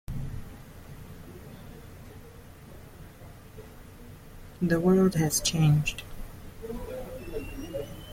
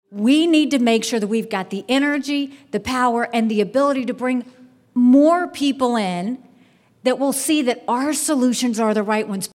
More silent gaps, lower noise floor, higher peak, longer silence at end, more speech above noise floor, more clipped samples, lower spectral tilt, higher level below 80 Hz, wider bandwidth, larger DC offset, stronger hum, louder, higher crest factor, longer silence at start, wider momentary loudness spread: neither; second, -48 dBFS vs -54 dBFS; second, -12 dBFS vs -6 dBFS; about the same, 0 s vs 0.1 s; second, 24 dB vs 36 dB; neither; first, -5.5 dB/octave vs -4 dB/octave; first, -46 dBFS vs -60 dBFS; about the same, 16.5 kHz vs 16 kHz; neither; neither; second, -28 LUFS vs -19 LUFS; about the same, 18 dB vs 14 dB; about the same, 0.1 s vs 0.1 s; first, 25 LU vs 10 LU